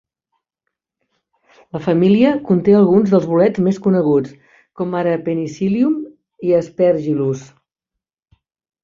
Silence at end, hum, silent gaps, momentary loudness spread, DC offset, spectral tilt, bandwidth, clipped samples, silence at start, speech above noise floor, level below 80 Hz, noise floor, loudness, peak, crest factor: 1.4 s; none; none; 12 LU; under 0.1%; -8.5 dB/octave; 7.4 kHz; under 0.1%; 1.75 s; 68 dB; -56 dBFS; -82 dBFS; -16 LUFS; -2 dBFS; 16 dB